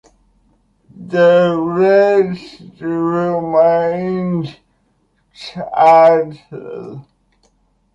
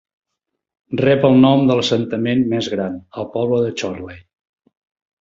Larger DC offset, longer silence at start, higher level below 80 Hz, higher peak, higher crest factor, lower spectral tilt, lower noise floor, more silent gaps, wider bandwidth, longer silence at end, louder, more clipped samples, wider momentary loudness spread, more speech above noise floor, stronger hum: neither; about the same, 0.95 s vs 0.9 s; about the same, -56 dBFS vs -52 dBFS; about the same, -2 dBFS vs -2 dBFS; about the same, 14 dB vs 16 dB; about the same, -7.5 dB/octave vs -6.5 dB/octave; second, -61 dBFS vs -79 dBFS; neither; about the same, 7.8 kHz vs 7.6 kHz; about the same, 0.95 s vs 1 s; first, -14 LUFS vs -17 LUFS; neither; first, 20 LU vs 15 LU; second, 47 dB vs 62 dB; neither